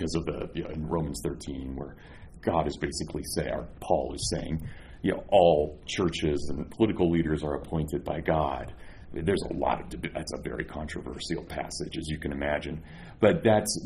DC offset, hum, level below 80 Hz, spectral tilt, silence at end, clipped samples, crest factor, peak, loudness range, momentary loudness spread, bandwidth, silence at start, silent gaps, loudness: under 0.1%; none; -44 dBFS; -5.5 dB/octave; 0 s; under 0.1%; 20 dB; -8 dBFS; 6 LU; 13 LU; 13 kHz; 0 s; none; -29 LUFS